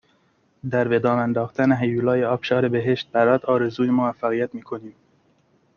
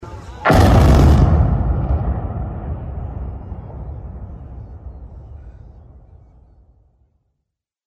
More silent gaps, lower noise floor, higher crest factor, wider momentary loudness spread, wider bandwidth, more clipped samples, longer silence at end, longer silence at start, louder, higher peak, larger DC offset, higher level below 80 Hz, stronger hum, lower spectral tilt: neither; second, -63 dBFS vs -78 dBFS; about the same, 18 dB vs 16 dB; second, 8 LU vs 26 LU; second, 6.8 kHz vs 14.5 kHz; neither; second, 0.85 s vs 2.35 s; first, 0.65 s vs 0 s; second, -21 LUFS vs -16 LUFS; about the same, -4 dBFS vs -2 dBFS; neither; second, -62 dBFS vs -22 dBFS; neither; about the same, -8 dB/octave vs -7.5 dB/octave